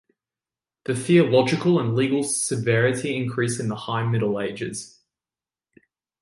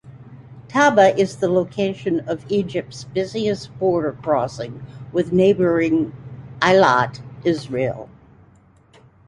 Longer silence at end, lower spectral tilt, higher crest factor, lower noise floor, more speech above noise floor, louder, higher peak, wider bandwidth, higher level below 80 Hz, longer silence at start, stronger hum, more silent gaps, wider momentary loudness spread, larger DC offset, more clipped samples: first, 1.35 s vs 1.2 s; about the same, -5.5 dB/octave vs -6 dB/octave; about the same, 18 dB vs 20 dB; first, under -90 dBFS vs -52 dBFS; first, over 68 dB vs 33 dB; second, -22 LUFS vs -19 LUFS; second, -4 dBFS vs 0 dBFS; about the same, 11.5 kHz vs 11.5 kHz; second, -62 dBFS vs -54 dBFS; first, 0.9 s vs 0.05 s; neither; neither; about the same, 12 LU vs 13 LU; neither; neither